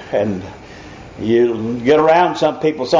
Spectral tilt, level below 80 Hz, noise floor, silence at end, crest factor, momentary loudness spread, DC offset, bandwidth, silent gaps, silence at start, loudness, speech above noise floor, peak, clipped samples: -6 dB/octave; -46 dBFS; -36 dBFS; 0 s; 12 dB; 24 LU; under 0.1%; 7.6 kHz; none; 0 s; -15 LUFS; 21 dB; -4 dBFS; under 0.1%